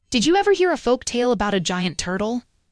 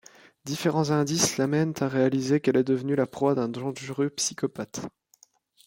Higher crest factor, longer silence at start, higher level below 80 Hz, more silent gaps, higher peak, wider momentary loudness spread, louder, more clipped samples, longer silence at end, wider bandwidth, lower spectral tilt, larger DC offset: about the same, 16 dB vs 16 dB; second, 0.1 s vs 0.45 s; first, -46 dBFS vs -66 dBFS; neither; first, -4 dBFS vs -10 dBFS; second, 7 LU vs 12 LU; first, -21 LUFS vs -26 LUFS; neither; second, 0.3 s vs 0.75 s; second, 11 kHz vs 16.5 kHz; about the same, -4 dB/octave vs -5 dB/octave; first, 0.1% vs under 0.1%